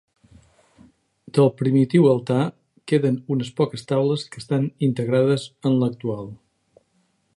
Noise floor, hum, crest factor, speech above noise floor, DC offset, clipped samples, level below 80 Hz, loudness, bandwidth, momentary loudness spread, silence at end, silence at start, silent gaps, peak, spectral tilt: -67 dBFS; none; 18 dB; 46 dB; under 0.1%; under 0.1%; -62 dBFS; -21 LUFS; 11.5 kHz; 10 LU; 1.05 s; 1.35 s; none; -4 dBFS; -8 dB/octave